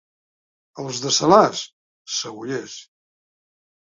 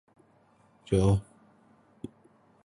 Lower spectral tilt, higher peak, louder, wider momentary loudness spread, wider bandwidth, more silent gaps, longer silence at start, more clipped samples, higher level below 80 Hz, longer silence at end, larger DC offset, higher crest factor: second, -3.5 dB/octave vs -8 dB/octave; first, 0 dBFS vs -10 dBFS; first, -20 LUFS vs -27 LUFS; about the same, 22 LU vs 22 LU; second, 7.8 kHz vs 11 kHz; first, 1.73-2.05 s vs none; second, 0.75 s vs 0.9 s; neither; second, -64 dBFS vs -46 dBFS; second, 1.05 s vs 1.45 s; neither; about the same, 24 dB vs 22 dB